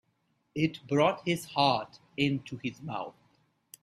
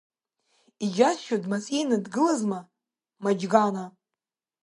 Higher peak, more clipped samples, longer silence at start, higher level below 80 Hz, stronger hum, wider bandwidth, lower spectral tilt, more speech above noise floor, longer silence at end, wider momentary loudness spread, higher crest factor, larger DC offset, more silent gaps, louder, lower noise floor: second, -12 dBFS vs -4 dBFS; neither; second, 0.55 s vs 0.8 s; first, -68 dBFS vs -76 dBFS; neither; first, 15 kHz vs 11.5 kHz; about the same, -5.5 dB/octave vs -5 dB/octave; second, 45 dB vs 64 dB; about the same, 0.7 s vs 0.75 s; first, 13 LU vs 10 LU; about the same, 20 dB vs 24 dB; neither; neither; second, -30 LUFS vs -26 LUFS; second, -75 dBFS vs -89 dBFS